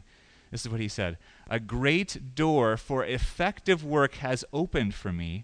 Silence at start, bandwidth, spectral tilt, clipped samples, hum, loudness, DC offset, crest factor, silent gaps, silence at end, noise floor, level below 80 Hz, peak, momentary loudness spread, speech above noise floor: 0.5 s; 10.5 kHz; -5.5 dB/octave; under 0.1%; none; -29 LUFS; under 0.1%; 18 dB; none; 0 s; -58 dBFS; -42 dBFS; -10 dBFS; 9 LU; 29 dB